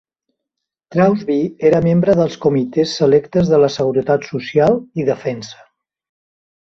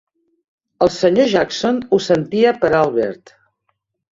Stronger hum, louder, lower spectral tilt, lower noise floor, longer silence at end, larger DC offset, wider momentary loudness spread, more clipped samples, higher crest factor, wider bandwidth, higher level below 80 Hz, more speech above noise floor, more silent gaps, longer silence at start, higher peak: neither; about the same, -16 LUFS vs -16 LUFS; first, -7 dB/octave vs -5.5 dB/octave; first, -80 dBFS vs -70 dBFS; first, 1.15 s vs 1 s; neither; about the same, 7 LU vs 6 LU; neither; about the same, 16 dB vs 16 dB; about the same, 7.6 kHz vs 7.8 kHz; about the same, -50 dBFS vs -54 dBFS; first, 65 dB vs 54 dB; neither; about the same, 0.9 s vs 0.8 s; about the same, -2 dBFS vs -2 dBFS